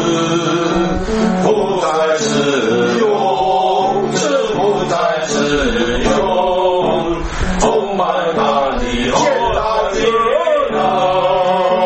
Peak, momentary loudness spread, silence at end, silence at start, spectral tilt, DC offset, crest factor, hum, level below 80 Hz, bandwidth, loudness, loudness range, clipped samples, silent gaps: 0 dBFS; 2 LU; 0 s; 0 s; -4.5 dB/octave; under 0.1%; 14 dB; none; -30 dBFS; 8.8 kHz; -15 LUFS; 1 LU; under 0.1%; none